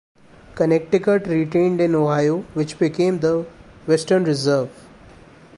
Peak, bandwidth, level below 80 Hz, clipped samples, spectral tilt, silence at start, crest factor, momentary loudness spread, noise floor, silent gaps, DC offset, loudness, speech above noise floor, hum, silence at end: -4 dBFS; 11.5 kHz; -54 dBFS; under 0.1%; -6.5 dB/octave; 0.55 s; 16 dB; 7 LU; -45 dBFS; none; under 0.1%; -19 LUFS; 27 dB; none; 0.85 s